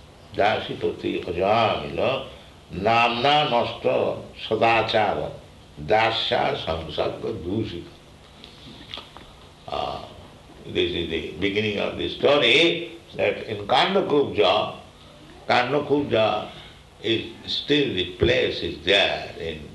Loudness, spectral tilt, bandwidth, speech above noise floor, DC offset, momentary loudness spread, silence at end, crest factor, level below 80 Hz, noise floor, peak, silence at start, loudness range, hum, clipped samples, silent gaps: -22 LUFS; -5 dB/octave; 12 kHz; 25 dB; under 0.1%; 18 LU; 0 s; 20 dB; -50 dBFS; -47 dBFS; -4 dBFS; 0.2 s; 10 LU; none; under 0.1%; none